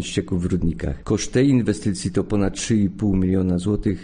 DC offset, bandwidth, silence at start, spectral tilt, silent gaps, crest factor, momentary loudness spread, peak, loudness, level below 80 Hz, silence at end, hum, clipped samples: under 0.1%; 10 kHz; 0 s; -6.5 dB/octave; none; 14 dB; 6 LU; -6 dBFS; -21 LUFS; -36 dBFS; 0 s; none; under 0.1%